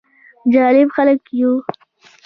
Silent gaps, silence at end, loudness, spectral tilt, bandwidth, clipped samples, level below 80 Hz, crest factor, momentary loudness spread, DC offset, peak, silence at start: none; 0.65 s; -15 LUFS; -7.5 dB/octave; 5.4 kHz; under 0.1%; -62 dBFS; 14 dB; 10 LU; under 0.1%; -2 dBFS; 0.45 s